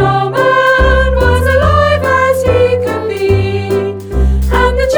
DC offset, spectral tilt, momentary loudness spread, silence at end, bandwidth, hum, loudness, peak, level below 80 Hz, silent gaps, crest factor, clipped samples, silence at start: under 0.1%; -6 dB/octave; 7 LU; 0 s; over 20 kHz; none; -11 LUFS; 0 dBFS; -18 dBFS; none; 10 dB; under 0.1%; 0 s